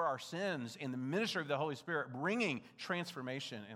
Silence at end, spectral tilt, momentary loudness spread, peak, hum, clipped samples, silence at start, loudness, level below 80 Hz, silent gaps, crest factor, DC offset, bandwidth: 0 s; -5 dB/octave; 6 LU; -22 dBFS; none; under 0.1%; 0 s; -39 LUFS; under -90 dBFS; none; 16 dB; under 0.1%; 15.5 kHz